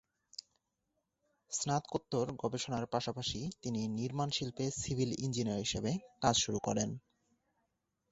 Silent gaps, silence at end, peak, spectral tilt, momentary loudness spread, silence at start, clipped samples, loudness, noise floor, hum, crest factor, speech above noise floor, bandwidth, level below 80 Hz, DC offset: none; 1.15 s; -14 dBFS; -4.5 dB/octave; 8 LU; 1.5 s; under 0.1%; -36 LUFS; -84 dBFS; none; 24 dB; 48 dB; 8.2 kHz; -62 dBFS; under 0.1%